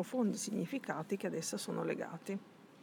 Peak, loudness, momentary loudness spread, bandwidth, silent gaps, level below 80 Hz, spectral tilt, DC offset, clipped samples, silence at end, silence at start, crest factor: -20 dBFS; -39 LUFS; 9 LU; 19.5 kHz; none; under -90 dBFS; -4.5 dB/octave; under 0.1%; under 0.1%; 0 s; 0 s; 18 dB